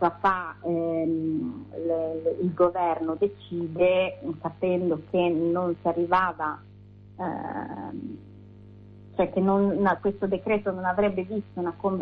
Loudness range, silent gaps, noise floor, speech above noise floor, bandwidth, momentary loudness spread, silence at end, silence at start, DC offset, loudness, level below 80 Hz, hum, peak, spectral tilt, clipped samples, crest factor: 4 LU; none; -48 dBFS; 23 dB; 5.2 kHz; 11 LU; 0 s; 0 s; under 0.1%; -27 LUFS; -56 dBFS; 50 Hz at -50 dBFS; -10 dBFS; -6 dB/octave; under 0.1%; 16 dB